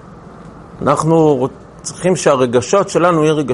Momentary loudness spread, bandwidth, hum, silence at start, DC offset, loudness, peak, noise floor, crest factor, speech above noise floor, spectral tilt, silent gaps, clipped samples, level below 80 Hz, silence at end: 9 LU; 11.5 kHz; none; 0.05 s; under 0.1%; -14 LUFS; 0 dBFS; -35 dBFS; 14 dB; 22 dB; -5.5 dB/octave; none; under 0.1%; -48 dBFS; 0 s